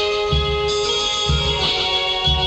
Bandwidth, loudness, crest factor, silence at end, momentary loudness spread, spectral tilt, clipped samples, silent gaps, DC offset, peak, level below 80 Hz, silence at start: 9 kHz; -18 LUFS; 12 dB; 0 s; 2 LU; -3.5 dB/octave; under 0.1%; none; under 0.1%; -6 dBFS; -28 dBFS; 0 s